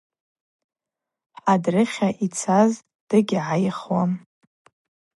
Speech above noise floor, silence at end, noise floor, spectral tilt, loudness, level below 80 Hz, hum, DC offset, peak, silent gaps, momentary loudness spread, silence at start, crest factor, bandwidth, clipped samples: 67 dB; 1 s; -87 dBFS; -6 dB/octave; -22 LUFS; -70 dBFS; none; under 0.1%; -4 dBFS; 2.95-3.07 s; 7 LU; 1.45 s; 18 dB; 11.5 kHz; under 0.1%